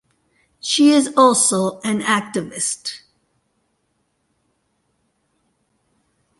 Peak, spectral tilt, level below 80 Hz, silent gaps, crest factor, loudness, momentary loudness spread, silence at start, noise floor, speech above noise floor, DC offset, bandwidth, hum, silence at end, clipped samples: -2 dBFS; -3 dB/octave; -66 dBFS; none; 18 dB; -17 LUFS; 15 LU; 0.65 s; -69 dBFS; 52 dB; under 0.1%; 11.5 kHz; none; 3.45 s; under 0.1%